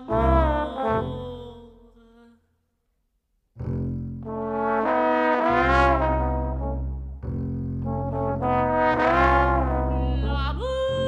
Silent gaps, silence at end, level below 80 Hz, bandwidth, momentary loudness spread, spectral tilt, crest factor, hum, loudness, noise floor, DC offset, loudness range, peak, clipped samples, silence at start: none; 0 s; -32 dBFS; 7.8 kHz; 14 LU; -8 dB/octave; 20 dB; none; -24 LUFS; -72 dBFS; under 0.1%; 11 LU; -4 dBFS; under 0.1%; 0 s